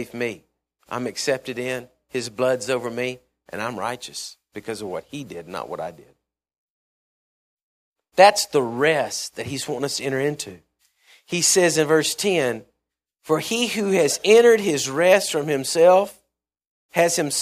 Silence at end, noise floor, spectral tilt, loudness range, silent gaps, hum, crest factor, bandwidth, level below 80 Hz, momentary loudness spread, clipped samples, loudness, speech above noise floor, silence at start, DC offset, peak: 0 s; -81 dBFS; -3 dB/octave; 15 LU; 6.58-7.57 s, 7.63-7.92 s, 16.67-16.89 s; none; 22 dB; 15.5 kHz; -66 dBFS; 18 LU; under 0.1%; -20 LUFS; 60 dB; 0 s; under 0.1%; 0 dBFS